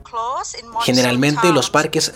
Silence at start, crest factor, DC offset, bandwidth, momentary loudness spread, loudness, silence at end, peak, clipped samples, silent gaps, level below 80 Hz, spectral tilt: 0.15 s; 16 dB; under 0.1%; 17 kHz; 10 LU; -17 LUFS; 0 s; -2 dBFS; under 0.1%; none; -52 dBFS; -4 dB/octave